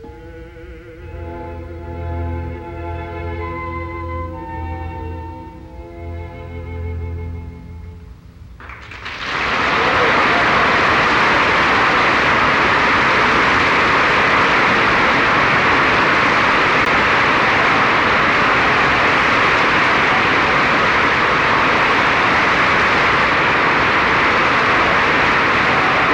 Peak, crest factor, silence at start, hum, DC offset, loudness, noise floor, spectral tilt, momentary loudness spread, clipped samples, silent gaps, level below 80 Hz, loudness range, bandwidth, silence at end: -4 dBFS; 12 dB; 0 s; none; under 0.1%; -13 LUFS; -38 dBFS; -4.5 dB/octave; 17 LU; under 0.1%; none; -36 dBFS; 16 LU; 16 kHz; 0 s